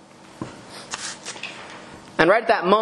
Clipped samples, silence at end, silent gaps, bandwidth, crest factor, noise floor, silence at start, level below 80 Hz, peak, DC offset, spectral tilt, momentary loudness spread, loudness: under 0.1%; 0 s; none; 12 kHz; 24 dB; -41 dBFS; 0.4 s; -58 dBFS; 0 dBFS; under 0.1%; -4 dB/octave; 21 LU; -22 LUFS